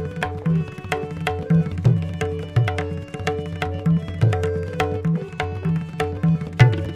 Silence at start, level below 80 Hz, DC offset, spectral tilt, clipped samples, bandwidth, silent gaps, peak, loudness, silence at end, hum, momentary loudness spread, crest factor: 0 s; -42 dBFS; under 0.1%; -7.5 dB/octave; under 0.1%; 11 kHz; none; 0 dBFS; -23 LUFS; 0 s; none; 8 LU; 20 dB